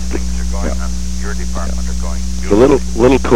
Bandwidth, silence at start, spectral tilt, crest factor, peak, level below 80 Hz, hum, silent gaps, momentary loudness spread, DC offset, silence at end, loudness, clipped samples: 13.5 kHz; 0 s; -6 dB/octave; 14 dB; -2 dBFS; -20 dBFS; 60 Hz at -20 dBFS; none; 11 LU; 10%; 0 s; -16 LUFS; under 0.1%